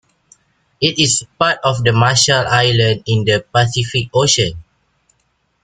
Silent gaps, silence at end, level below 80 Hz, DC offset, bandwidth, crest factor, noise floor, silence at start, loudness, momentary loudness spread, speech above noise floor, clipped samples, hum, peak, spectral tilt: none; 1.05 s; -46 dBFS; under 0.1%; 9.6 kHz; 16 dB; -64 dBFS; 0.8 s; -14 LUFS; 5 LU; 49 dB; under 0.1%; none; 0 dBFS; -3.5 dB/octave